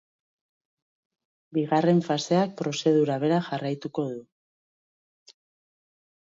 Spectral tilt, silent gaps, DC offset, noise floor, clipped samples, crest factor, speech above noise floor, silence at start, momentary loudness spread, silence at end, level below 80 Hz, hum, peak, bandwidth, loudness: -6.5 dB/octave; none; under 0.1%; under -90 dBFS; under 0.1%; 18 dB; over 65 dB; 1.5 s; 9 LU; 2.1 s; -74 dBFS; none; -10 dBFS; 7.8 kHz; -25 LUFS